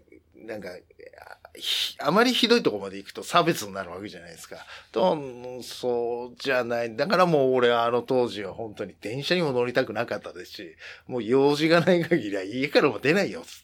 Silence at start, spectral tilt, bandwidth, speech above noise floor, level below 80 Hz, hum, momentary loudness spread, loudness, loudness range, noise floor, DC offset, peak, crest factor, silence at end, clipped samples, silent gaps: 0.4 s; -5 dB/octave; 17.5 kHz; 22 dB; -66 dBFS; none; 19 LU; -24 LUFS; 4 LU; -47 dBFS; under 0.1%; -6 dBFS; 20 dB; 0.05 s; under 0.1%; none